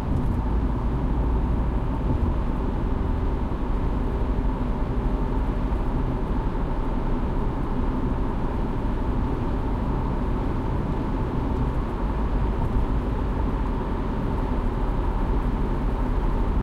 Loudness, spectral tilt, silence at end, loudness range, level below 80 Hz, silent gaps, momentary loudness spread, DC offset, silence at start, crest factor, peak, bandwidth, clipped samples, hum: -27 LUFS; -9 dB/octave; 0 s; 1 LU; -26 dBFS; none; 2 LU; under 0.1%; 0 s; 12 dB; -10 dBFS; 5.2 kHz; under 0.1%; none